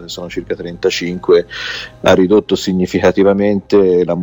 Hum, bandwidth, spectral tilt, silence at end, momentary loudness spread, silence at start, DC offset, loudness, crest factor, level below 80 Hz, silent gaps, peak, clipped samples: none; 17.5 kHz; -5.5 dB/octave; 0 s; 12 LU; 0 s; under 0.1%; -14 LUFS; 14 dB; -44 dBFS; none; 0 dBFS; under 0.1%